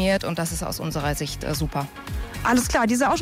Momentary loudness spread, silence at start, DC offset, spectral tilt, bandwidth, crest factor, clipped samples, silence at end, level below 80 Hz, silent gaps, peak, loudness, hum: 11 LU; 0 s; under 0.1%; -4.5 dB/octave; 16 kHz; 12 dB; under 0.1%; 0 s; -36 dBFS; none; -12 dBFS; -24 LUFS; none